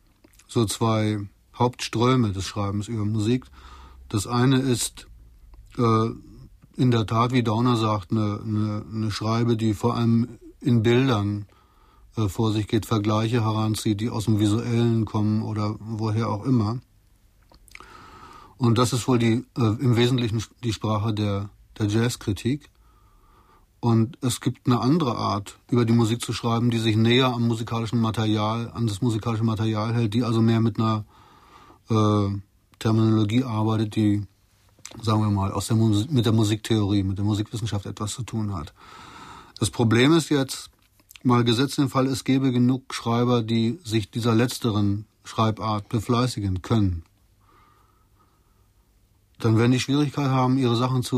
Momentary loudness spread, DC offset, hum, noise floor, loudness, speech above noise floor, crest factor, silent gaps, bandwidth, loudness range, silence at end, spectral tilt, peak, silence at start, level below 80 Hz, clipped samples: 9 LU; under 0.1%; none; -61 dBFS; -23 LUFS; 38 dB; 16 dB; none; 14.5 kHz; 4 LU; 0 s; -6.5 dB/octave; -8 dBFS; 0.5 s; -52 dBFS; under 0.1%